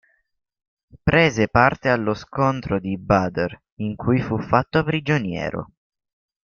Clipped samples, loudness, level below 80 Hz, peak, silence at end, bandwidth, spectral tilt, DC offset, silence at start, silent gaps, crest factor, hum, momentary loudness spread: under 0.1%; -21 LUFS; -46 dBFS; -2 dBFS; 0.85 s; 7.2 kHz; -7 dB/octave; under 0.1%; 0.95 s; 3.72-3.77 s; 20 dB; none; 11 LU